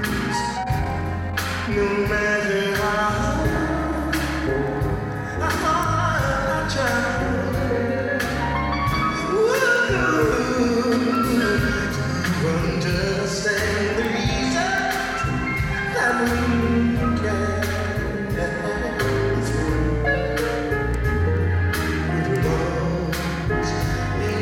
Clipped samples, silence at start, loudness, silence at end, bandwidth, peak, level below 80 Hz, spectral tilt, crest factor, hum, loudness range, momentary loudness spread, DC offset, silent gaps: under 0.1%; 0 s; -22 LUFS; 0 s; 17 kHz; -8 dBFS; -32 dBFS; -5.5 dB/octave; 14 dB; none; 3 LU; 5 LU; under 0.1%; none